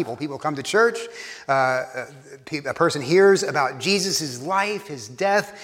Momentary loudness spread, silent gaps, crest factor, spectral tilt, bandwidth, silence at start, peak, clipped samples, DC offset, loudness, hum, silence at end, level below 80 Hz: 15 LU; none; 18 dB; -3.5 dB/octave; 16 kHz; 0 s; -6 dBFS; under 0.1%; under 0.1%; -21 LUFS; none; 0 s; -70 dBFS